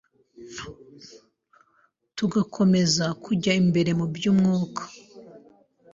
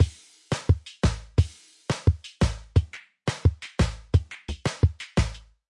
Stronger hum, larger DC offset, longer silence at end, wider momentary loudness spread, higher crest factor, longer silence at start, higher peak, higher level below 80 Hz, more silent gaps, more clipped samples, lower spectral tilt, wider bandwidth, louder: neither; neither; first, 0.55 s vs 0.3 s; first, 19 LU vs 8 LU; about the same, 18 dB vs 18 dB; first, 0.4 s vs 0 s; about the same, -8 dBFS vs -8 dBFS; second, -60 dBFS vs -34 dBFS; neither; neither; about the same, -5.5 dB/octave vs -6 dB/octave; second, 7.8 kHz vs 11.5 kHz; first, -23 LUFS vs -27 LUFS